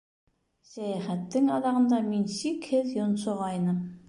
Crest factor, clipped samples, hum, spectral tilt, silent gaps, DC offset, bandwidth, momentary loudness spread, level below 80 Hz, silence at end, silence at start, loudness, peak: 12 dB; under 0.1%; none; -6.5 dB/octave; none; under 0.1%; 11.5 kHz; 8 LU; -70 dBFS; 0.1 s; 0.7 s; -28 LUFS; -16 dBFS